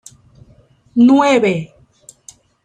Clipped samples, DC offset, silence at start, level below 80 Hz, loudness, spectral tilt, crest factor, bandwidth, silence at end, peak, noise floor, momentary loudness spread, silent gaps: under 0.1%; under 0.1%; 0.95 s; -56 dBFS; -13 LUFS; -6 dB/octave; 16 dB; 10.5 kHz; 1 s; -2 dBFS; -50 dBFS; 14 LU; none